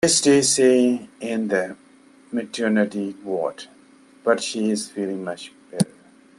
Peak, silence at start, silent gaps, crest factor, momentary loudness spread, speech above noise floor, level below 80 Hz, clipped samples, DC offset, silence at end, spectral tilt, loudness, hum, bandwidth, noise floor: -4 dBFS; 0 s; none; 18 dB; 15 LU; 31 dB; -64 dBFS; under 0.1%; under 0.1%; 0.55 s; -3.5 dB/octave; -22 LUFS; none; 12.5 kHz; -51 dBFS